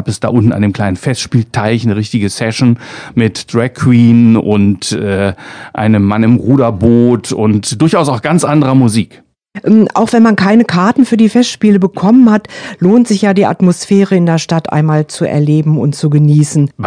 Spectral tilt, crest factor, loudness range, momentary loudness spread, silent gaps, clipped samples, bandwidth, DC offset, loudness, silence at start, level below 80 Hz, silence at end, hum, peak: -6.5 dB/octave; 10 dB; 2 LU; 7 LU; none; 1%; 10 kHz; under 0.1%; -10 LUFS; 0 s; -46 dBFS; 0 s; none; 0 dBFS